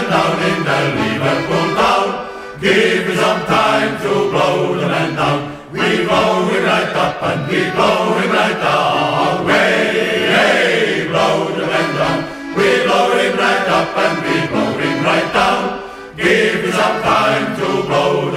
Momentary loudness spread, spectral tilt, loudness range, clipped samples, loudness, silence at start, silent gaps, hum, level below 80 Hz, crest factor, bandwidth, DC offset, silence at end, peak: 5 LU; -4.5 dB/octave; 2 LU; under 0.1%; -14 LUFS; 0 s; none; none; -46 dBFS; 14 dB; 16 kHz; under 0.1%; 0 s; 0 dBFS